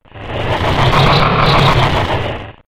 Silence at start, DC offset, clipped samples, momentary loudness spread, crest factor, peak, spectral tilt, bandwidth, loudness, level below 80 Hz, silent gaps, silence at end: 0.05 s; under 0.1%; under 0.1%; 11 LU; 12 dB; 0 dBFS; -6 dB/octave; 14.5 kHz; -12 LUFS; -24 dBFS; none; 0.05 s